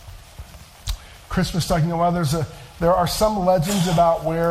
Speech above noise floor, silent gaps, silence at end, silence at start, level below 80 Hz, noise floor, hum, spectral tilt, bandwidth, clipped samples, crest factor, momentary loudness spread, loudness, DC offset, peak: 21 dB; none; 0 s; 0 s; -36 dBFS; -40 dBFS; none; -5.5 dB/octave; 16 kHz; under 0.1%; 14 dB; 14 LU; -20 LUFS; under 0.1%; -6 dBFS